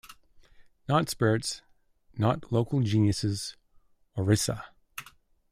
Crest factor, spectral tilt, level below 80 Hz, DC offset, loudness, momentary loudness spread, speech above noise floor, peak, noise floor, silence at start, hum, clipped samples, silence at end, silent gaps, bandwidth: 20 dB; -5.5 dB/octave; -58 dBFS; under 0.1%; -28 LUFS; 18 LU; 35 dB; -10 dBFS; -62 dBFS; 0.05 s; none; under 0.1%; 0.5 s; none; 15.5 kHz